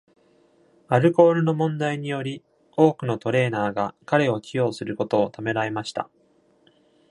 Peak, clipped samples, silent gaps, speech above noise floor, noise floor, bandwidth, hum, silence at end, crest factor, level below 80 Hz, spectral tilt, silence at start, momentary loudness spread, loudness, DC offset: -2 dBFS; under 0.1%; none; 38 dB; -60 dBFS; 11 kHz; none; 1.1 s; 22 dB; -66 dBFS; -7 dB/octave; 0.9 s; 13 LU; -23 LUFS; under 0.1%